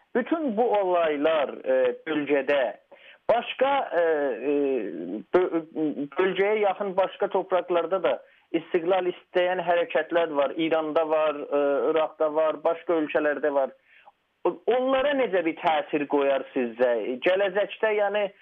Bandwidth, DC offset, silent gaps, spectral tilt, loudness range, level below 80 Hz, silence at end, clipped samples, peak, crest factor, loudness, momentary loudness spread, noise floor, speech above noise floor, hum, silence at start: 4.6 kHz; under 0.1%; none; -7.5 dB/octave; 1 LU; -70 dBFS; 0.1 s; under 0.1%; -10 dBFS; 14 dB; -25 LUFS; 5 LU; -58 dBFS; 33 dB; none; 0.15 s